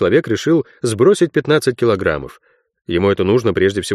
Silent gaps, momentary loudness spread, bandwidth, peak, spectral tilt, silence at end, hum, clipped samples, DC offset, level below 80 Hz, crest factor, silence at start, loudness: none; 8 LU; 13 kHz; -2 dBFS; -6 dB/octave; 0 s; none; under 0.1%; under 0.1%; -46 dBFS; 14 dB; 0 s; -16 LUFS